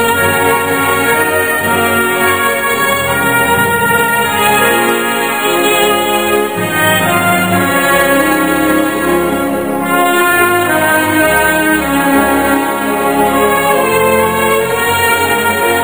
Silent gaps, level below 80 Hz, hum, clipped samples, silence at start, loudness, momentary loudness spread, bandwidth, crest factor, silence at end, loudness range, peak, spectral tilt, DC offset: none; -40 dBFS; none; under 0.1%; 0 s; -11 LUFS; 3 LU; over 20 kHz; 12 dB; 0 s; 1 LU; 0 dBFS; -3.5 dB/octave; 0.8%